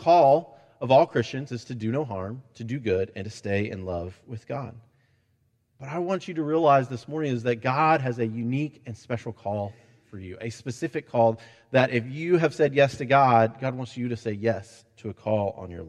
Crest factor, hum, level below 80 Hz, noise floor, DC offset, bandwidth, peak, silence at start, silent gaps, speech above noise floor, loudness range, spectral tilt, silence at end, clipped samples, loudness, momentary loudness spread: 20 dB; none; -62 dBFS; -69 dBFS; under 0.1%; 10.5 kHz; -6 dBFS; 0 s; none; 44 dB; 9 LU; -7 dB/octave; 0 s; under 0.1%; -25 LUFS; 16 LU